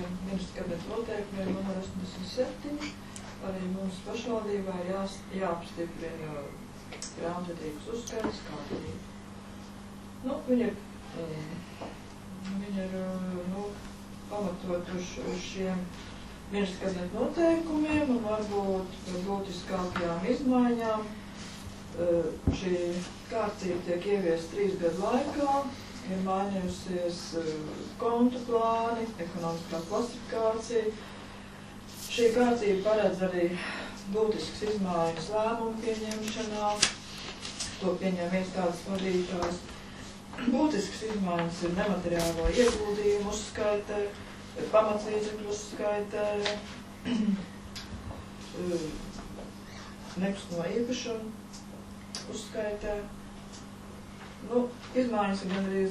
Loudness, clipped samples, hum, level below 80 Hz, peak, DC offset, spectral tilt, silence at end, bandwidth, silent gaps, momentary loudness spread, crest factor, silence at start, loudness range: -32 LUFS; under 0.1%; 50 Hz at -50 dBFS; -50 dBFS; -4 dBFS; under 0.1%; -5 dB/octave; 0 s; 13.5 kHz; none; 16 LU; 28 dB; 0 s; 7 LU